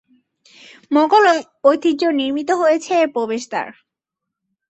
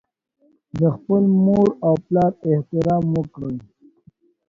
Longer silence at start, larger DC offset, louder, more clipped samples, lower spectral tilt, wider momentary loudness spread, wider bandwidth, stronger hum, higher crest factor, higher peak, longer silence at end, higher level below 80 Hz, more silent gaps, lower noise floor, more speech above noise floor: first, 0.9 s vs 0.75 s; neither; about the same, -17 LUFS vs -19 LUFS; neither; second, -3.5 dB/octave vs -11 dB/octave; second, 10 LU vs 14 LU; first, 8.4 kHz vs 7 kHz; neither; about the same, 16 dB vs 16 dB; about the same, -2 dBFS vs -4 dBFS; about the same, 1 s vs 0.9 s; second, -68 dBFS vs -52 dBFS; neither; first, -82 dBFS vs -55 dBFS; first, 66 dB vs 37 dB